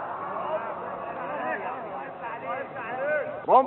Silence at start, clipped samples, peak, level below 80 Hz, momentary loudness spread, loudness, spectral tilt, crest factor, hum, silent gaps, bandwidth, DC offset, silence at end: 0 s; under 0.1%; -6 dBFS; -72 dBFS; 7 LU; -31 LUFS; -3.5 dB/octave; 22 dB; none; none; 4.2 kHz; under 0.1%; 0 s